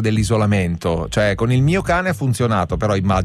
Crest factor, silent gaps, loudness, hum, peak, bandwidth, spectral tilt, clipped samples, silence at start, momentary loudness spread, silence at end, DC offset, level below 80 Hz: 10 dB; none; -18 LUFS; none; -6 dBFS; 14 kHz; -6.5 dB/octave; under 0.1%; 0 s; 4 LU; 0 s; under 0.1%; -34 dBFS